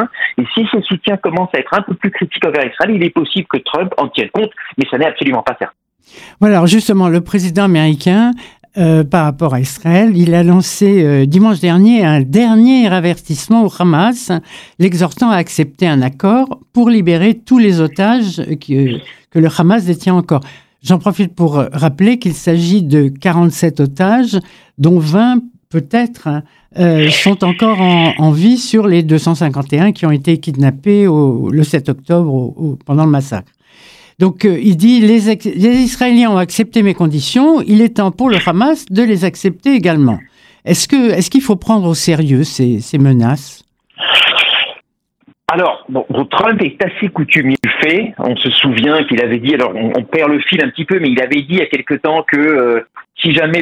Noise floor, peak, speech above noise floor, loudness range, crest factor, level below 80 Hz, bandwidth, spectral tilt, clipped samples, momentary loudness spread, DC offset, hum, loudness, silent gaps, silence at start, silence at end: -53 dBFS; 0 dBFS; 42 dB; 4 LU; 12 dB; -50 dBFS; 15 kHz; -6 dB/octave; under 0.1%; 8 LU; under 0.1%; none; -12 LUFS; none; 0 s; 0 s